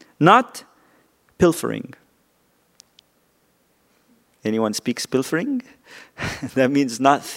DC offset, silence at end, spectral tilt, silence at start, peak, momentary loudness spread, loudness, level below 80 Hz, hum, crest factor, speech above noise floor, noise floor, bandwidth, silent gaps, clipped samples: under 0.1%; 0 s; -5 dB/octave; 0.2 s; 0 dBFS; 17 LU; -20 LUFS; -56 dBFS; none; 22 dB; 43 dB; -63 dBFS; 16 kHz; none; under 0.1%